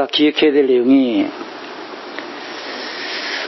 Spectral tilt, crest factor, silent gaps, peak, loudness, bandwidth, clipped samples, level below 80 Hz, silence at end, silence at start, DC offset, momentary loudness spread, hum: -4.5 dB/octave; 14 dB; none; -2 dBFS; -16 LUFS; 6 kHz; under 0.1%; -66 dBFS; 0 s; 0 s; under 0.1%; 17 LU; none